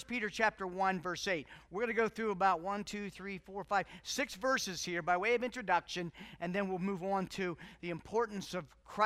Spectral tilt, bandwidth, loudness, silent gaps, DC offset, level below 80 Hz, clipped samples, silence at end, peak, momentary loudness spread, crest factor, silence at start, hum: -4 dB/octave; 15.5 kHz; -36 LUFS; none; under 0.1%; -66 dBFS; under 0.1%; 0 s; -16 dBFS; 11 LU; 20 dB; 0 s; none